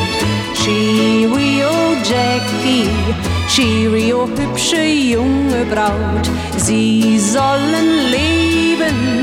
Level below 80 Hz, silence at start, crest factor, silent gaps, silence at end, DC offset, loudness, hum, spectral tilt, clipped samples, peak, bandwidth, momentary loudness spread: -36 dBFS; 0 s; 12 dB; none; 0 s; under 0.1%; -14 LUFS; none; -4.5 dB/octave; under 0.1%; -2 dBFS; 16.5 kHz; 4 LU